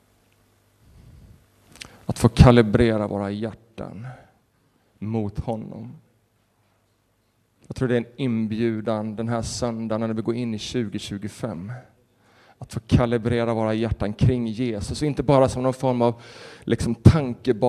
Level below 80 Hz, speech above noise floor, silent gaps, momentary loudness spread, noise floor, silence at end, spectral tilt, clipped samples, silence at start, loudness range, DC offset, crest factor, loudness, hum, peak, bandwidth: -38 dBFS; 44 dB; none; 20 LU; -66 dBFS; 0 s; -7 dB/octave; under 0.1%; 1.8 s; 12 LU; under 0.1%; 24 dB; -22 LUFS; none; 0 dBFS; 13 kHz